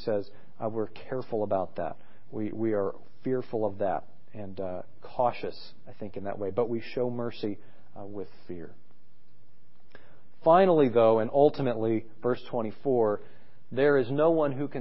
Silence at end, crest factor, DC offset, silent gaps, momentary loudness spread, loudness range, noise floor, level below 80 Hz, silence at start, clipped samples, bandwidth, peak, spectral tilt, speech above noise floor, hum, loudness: 0 s; 22 dB; 2%; none; 20 LU; 10 LU; -65 dBFS; -64 dBFS; 0 s; under 0.1%; 5.8 kHz; -8 dBFS; -11 dB/octave; 37 dB; none; -28 LUFS